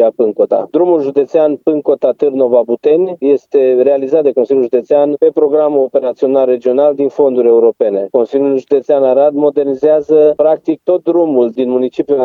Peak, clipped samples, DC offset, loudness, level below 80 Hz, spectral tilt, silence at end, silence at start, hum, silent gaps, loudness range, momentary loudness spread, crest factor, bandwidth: 0 dBFS; under 0.1%; under 0.1%; -11 LUFS; -66 dBFS; -8.5 dB/octave; 0 s; 0 s; none; none; 1 LU; 4 LU; 10 dB; 4.6 kHz